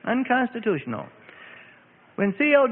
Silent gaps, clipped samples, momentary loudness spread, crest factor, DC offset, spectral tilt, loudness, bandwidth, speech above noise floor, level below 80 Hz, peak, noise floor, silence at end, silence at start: none; under 0.1%; 25 LU; 18 dB; under 0.1%; -10.5 dB/octave; -24 LUFS; 4 kHz; 31 dB; -68 dBFS; -6 dBFS; -54 dBFS; 0 s; 0.05 s